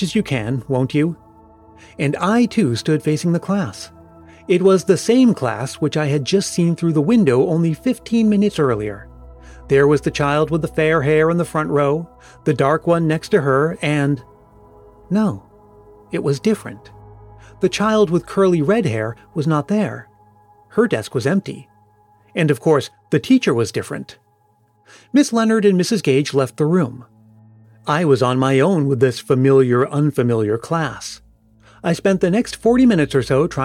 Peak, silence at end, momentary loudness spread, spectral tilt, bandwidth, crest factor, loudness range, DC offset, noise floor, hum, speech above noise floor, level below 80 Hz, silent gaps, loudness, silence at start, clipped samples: -2 dBFS; 0 s; 11 LU; -6.5 dB/octave; 15.5 kHz; 16 dB; 4 LU; under 0.1%; -58 dBFS; none; 42 dB; -48 dBFS; none; -17 LUFS; 0 s; under 0.1%